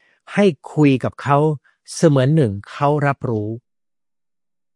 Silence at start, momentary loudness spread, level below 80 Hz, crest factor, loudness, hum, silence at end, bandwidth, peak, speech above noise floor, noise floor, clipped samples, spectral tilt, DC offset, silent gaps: 0.3 s; 12 LU; -60 dBFS; 18 dB; -18 LUFS; none; 1.15 s; 11.5 kHz; -2 dBFS; over 73 dB; under -90 dBFS; under 0.1%; -7 dB/octave; under 0.1%; none